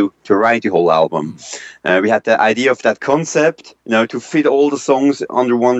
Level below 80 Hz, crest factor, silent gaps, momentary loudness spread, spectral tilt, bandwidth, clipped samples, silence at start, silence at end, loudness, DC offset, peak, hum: -62 dBFS; 14 dB; none; 8 LU; -5 dB/octave; 8.4 kHz; under 0.1%; 0 s; 0 s; -15 LUFS; under 0.1%; 0 dBFS; none